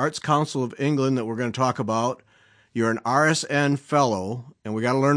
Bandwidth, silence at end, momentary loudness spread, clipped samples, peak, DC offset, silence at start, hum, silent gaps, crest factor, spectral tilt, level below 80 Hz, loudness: 10.5 kHz; 0 s; 10 LU; under 0.1%; -6 dBFS; under 0.1%; 0 s; none; none; 16 dB; -5.5 dB/octave; -68 dBFS; -23 LUFS